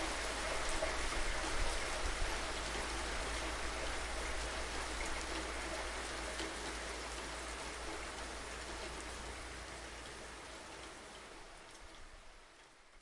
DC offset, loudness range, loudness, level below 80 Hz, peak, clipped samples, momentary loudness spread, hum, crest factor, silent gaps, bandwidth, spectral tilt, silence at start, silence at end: under 0.1%; 10 LU; -41 LUFS; -48 dBFS; -24 dBFS; under 0.1%; 15 LU; none; 18 dB; none; 12 kHz; -2.5 dB/octave; 0 s; 0 s